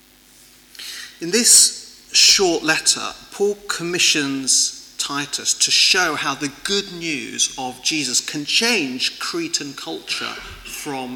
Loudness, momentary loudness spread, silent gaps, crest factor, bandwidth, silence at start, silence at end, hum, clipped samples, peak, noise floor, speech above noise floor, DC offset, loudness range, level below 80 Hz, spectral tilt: -17 LUFS; 18 LU; none; 18 dB; 19 kHz; 0.8 s; 0 s; none; under 0.1%; -2 dBFS; -49 dBFS; 29 dB; under 0.1%; 5 LU; -56 dBFS; -0.5 dB/octave